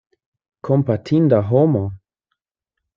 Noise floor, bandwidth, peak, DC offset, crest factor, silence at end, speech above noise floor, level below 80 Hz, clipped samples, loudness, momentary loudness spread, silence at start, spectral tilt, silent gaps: -82 dBFS; 7.2 kHz; -2 dBFS; under 0.1%; 18 dB; 1 s; 65 dB; -58 dBFS; under 0.1%; -17 LUFS; 11 LU; 0.65 s; -10.5 dB/octave; none